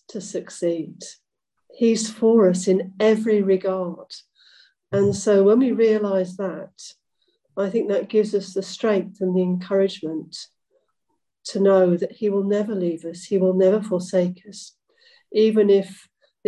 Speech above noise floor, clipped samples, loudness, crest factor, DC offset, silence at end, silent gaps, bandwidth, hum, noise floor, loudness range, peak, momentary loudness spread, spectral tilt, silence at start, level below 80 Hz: 56 dB; under 0.1%; -21 LUFS; 14 dB; under 0.1%; 0.55 s; none; 11 kHz; none; -76 dBFS; 4 LU; -6 dBFS; 19 LU; -6 dB/octave; 0.15 s; -66 dBFS